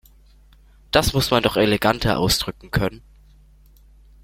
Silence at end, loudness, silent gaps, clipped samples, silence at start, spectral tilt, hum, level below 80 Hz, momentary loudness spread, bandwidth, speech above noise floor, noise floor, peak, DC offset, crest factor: 1.25 s; -20 LUFS; none; under 0.1%; 0.95 s; -4.5 dB/octave; none; -38 dBFS; 6 LU; 16.5 kHz; 31 dB; -51 dBFS; -2 dBFS; under 0.1%; 22 dB